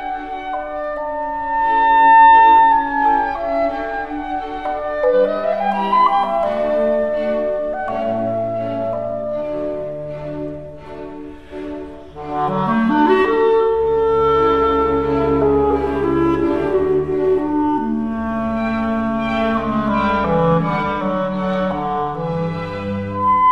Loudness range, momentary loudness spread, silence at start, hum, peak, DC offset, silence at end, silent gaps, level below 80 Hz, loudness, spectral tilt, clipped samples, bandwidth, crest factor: 10 LU; 12 LU; 0 s; none; -2 dBFS; 0.8%; 0 s; none; -40 dBFS; -17 LUFS; -8 dB/octave; under 0.1%; 6.6 kHz; 16 dB